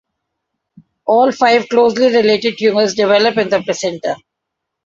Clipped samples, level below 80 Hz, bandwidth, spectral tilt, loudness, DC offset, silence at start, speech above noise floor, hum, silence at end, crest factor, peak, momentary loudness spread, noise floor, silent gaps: under 0.1%; -60 dBFS; 7.8 kHz; -4 dB/octave; -13 LUFS; under 0.1%; 1.05 s; 65 dB; none; 0.7 s; 14 dB; 0 dBFS; 10 LU; -77 dBFS; none